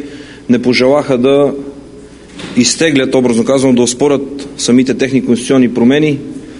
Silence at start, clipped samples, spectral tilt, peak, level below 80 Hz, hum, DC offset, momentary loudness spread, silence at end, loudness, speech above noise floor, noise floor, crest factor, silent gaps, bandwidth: 0 s; 0.1%; -4.5 dB/octave; 0 dBFS; -44 dBFS; none; under 0.1%; 12 LU; 0 s; -11 LUFS; 23 dB; -34 dBFS; 12 dB; none; 11 kHz